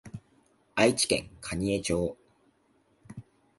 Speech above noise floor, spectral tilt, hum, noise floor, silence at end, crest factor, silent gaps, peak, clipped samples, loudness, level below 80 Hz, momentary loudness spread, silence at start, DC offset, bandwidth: 40 dB; -4 dB/octave; none; -68 dBFS; 0.35 s; 24 dB; none; -8 dBFS; under 0.1%; -28 LUFS; -52 dBFS; 24 LU; 0.05 s; under 0.1%; 12 kHz